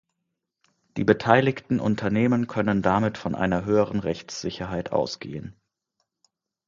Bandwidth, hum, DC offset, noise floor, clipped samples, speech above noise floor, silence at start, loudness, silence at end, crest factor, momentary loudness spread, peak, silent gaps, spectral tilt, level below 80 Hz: 7.6 kHz; none; under 0.1%; -81 dBFS; under 0.1%; 57 dB; 0.95 s; -24 LUFS; 1.15 s; 24 dB; 13 LU; -2 dBFS; none; -6.5 dB/octave; -52 dBFS